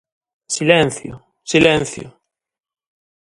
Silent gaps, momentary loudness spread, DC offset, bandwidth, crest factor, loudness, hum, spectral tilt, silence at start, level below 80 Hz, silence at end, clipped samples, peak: none; 20 LU; under 0.1%; 11.5 kHz; 20 dB; -16 LUFS; none; -4 dB/octave; 0.5 s; -50 dBFS; 1.25 s; under 0.1%; 0 dBFS